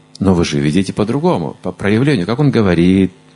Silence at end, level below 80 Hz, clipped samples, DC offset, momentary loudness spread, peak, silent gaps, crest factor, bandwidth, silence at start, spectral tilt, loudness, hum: 0.25 s; -36 dBFS; under 0.1%; under 0.1%; 6 LU; 0 dBFS; none; 14 dB; 11.5 kHz; 0.2 s; -7 dB/octave; -14 LUFS; none